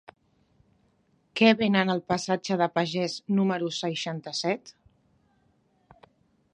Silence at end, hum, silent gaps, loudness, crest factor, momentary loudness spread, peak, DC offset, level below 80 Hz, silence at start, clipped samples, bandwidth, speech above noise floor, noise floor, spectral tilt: 1.85 s; none; none; -26 LUFS; 22 dB; 10 LU; -6 dBFS; under 0.1%; -70 dBFS; 1.35 s; under 0.1%; 10.5 kHz; 42 dB; -67 dBFS; -5 dB/octave